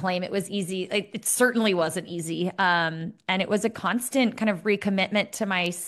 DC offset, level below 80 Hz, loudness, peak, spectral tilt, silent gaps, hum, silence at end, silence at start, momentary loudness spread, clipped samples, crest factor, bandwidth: under 0.1%; -68 dBFS; -25 LUFS; -8 dBFS; -4 dB/octave; none; none; 0 s; 0 s; 7 LU; under 0.1%; 18 dB; 13 kHz